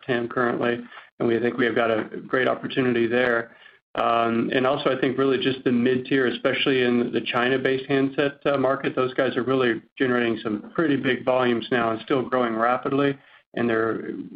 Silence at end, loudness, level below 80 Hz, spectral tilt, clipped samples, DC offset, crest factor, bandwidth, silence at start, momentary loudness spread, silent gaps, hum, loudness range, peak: 0 s; -23 LUFS; -64 dBFS; -8 dB/octave; under 0.1%; under 0.1%; 16 dB; 5.2 kHz; 0.1 s; 5 LU; 1.12-1.18 s, 3.82-3.94 s, 9.92-9.96 s, 13.46-13.52 s; none; 1 LU; -8 dBFS